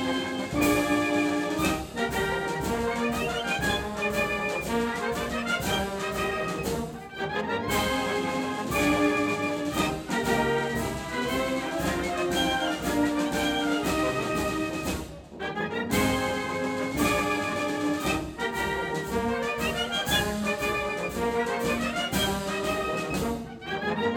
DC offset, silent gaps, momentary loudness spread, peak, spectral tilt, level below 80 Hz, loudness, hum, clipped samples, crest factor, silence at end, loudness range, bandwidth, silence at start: under 0.1%; none; 5 LU; -12 dBFS; -4 dB/octave; -46 dBFS; -27 LUFS; none; under 0.1%; 16 dB; 0 s; 2 LU; over 20 kHz; 0 s